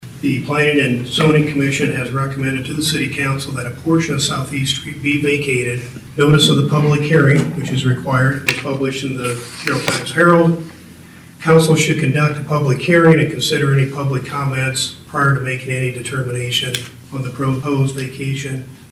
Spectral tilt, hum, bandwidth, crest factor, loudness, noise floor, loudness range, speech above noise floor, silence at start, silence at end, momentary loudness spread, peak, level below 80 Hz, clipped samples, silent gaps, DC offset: -5 dB/octave; none; 16 kHz; 14 dB; -16 LUFS; -39 dBFS; 5 LU; 23 dB; 0 s; 0.05 s; 11 LU; -2 dBFS; -48 dBFS; under 0.1%; none; under 0.1%